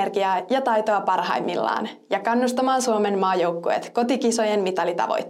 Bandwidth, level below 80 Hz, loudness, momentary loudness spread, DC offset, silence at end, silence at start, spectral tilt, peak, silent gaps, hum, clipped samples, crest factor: 15.5 kHz; -78 dBFS; -22 LUFS; 4 LU; under 0.1%; 0 s; 0 s; -4 dB/octave; -6 dBFS; none; none; under 0.1%; 16 dB